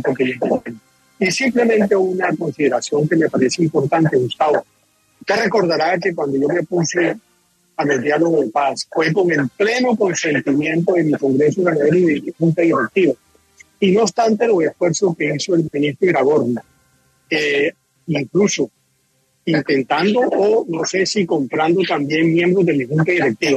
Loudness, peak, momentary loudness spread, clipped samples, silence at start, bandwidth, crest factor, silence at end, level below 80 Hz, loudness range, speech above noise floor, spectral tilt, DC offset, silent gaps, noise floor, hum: -17 LUFS; -2 dBFS; 6 LU; under 0.1%; 0 s; 12 kHz; 14 dB; 0 s; -62 dBFS; 2 LU; 46 dB; -5.5 dB/octave; under 0.1%; none; -62 dBFS; none